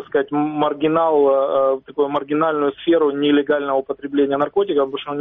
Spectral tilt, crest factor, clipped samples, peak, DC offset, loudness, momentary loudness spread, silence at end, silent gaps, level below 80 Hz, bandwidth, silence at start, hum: -4 dB/octave; 14 dB; under 0.1%; -4 dBFS; under 0.1%; -18 LUFS; 5 LU; 0 s; none; -60 dBFS; 3.9 kHz; 0 s; none